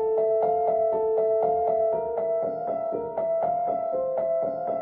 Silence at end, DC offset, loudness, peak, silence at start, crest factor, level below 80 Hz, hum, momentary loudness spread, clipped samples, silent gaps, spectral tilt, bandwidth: 0 s; under 0.1%; -25 LUFS; -12 dBFS; 0 s; 12 dB; -62 dBFS; none; 5 LU; under 0.1%; none; -10.5 dB/octave; 2.8 kHz